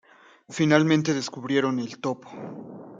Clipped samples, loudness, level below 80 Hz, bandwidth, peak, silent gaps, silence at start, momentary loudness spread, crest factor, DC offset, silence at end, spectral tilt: under 0.1%; -24 LUFS; -68 dBFS; 7.8 kHz; -4 dBFS; none; 0.5 s; 19 LU; 22 dB; under 0.1%; 0 s; -5.5 dB/octave